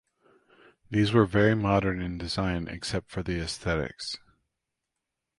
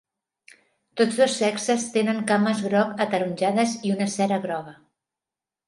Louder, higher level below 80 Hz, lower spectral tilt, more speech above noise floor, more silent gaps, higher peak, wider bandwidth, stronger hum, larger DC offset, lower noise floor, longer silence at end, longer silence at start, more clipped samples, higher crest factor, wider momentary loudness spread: second, -28 LUFS vs -23 LUFS; first, -46 dBFS vs -72 dBFS; first, -6 dB/octave vs -4.5 dB/octave; second, 58 dB vs 67 dB; neither; about the same, -8 dBFS vs -6 dBFS; about the same, 11.5 kHz vs 11.5 kHz; neither; neither; second, -85 dBFS vs -90 dBFS; first, 1.2 s vs 0.95 s; about the same, 0.9 s vs 0.95 s; neither; about the same, 20 dB vs 18 dB; first, 11 LU vs 6 LU